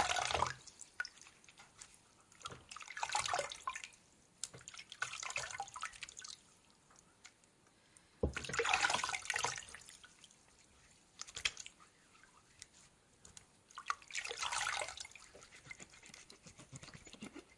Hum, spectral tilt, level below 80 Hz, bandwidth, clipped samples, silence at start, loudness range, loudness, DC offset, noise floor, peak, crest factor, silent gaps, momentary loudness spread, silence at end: none; -1 dB/octave; -64 dBFS; 11.5 kHz; under 0.1%; 0 s; 9 LU; -41 LUFS; under 0.1%; -69 dBFS; -16 dBFS; 28 dB; none; 22 LU; 0.05 s